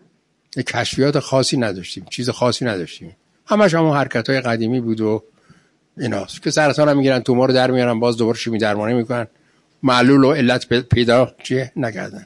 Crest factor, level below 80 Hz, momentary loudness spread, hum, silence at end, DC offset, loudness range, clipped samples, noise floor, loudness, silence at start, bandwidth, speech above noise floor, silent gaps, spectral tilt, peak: 16 dB; -52 dBFS; 10 LU; none; 0 s; under 0.1%; 3 LU; under 0.1%; -60 dBFS; -17 LUFS; 0.55 s; 11.5 kHz; 43 dB; none; -5.5 dB/octave; -2 dBFS